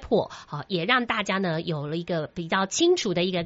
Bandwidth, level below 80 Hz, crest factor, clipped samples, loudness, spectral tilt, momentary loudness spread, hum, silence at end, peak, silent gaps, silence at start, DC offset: 8 kHz; -56 dBFS; 20 dB; under 0.1%; -25 LUFS; -3.5 dB/octave; 8 LU; none; 0 s; -6 dBFS; none; 0 s; under 0.1%